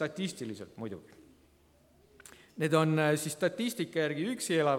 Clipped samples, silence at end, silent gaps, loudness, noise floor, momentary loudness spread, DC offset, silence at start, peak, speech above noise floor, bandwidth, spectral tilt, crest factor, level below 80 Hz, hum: under 0.1%; 0 s; none; -32 LUFS; -64 dBFS; 16 LU; under 0.1%; 0 s; -12 dBFS; 33 dB; 17 kHz; -5 dB/octave; 20 dB; -72 dBFS; none